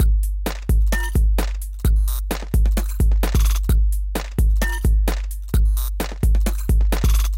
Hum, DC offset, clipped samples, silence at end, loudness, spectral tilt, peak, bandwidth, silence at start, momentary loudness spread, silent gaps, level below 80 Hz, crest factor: none; under 0.1%; under 0.1%; 0 s; -21 LUFS; -5.5 dB/octave; -8 dBFS; 16.5 kHz; 0 s; 6 LU; none; -18 dBFS; 10 dB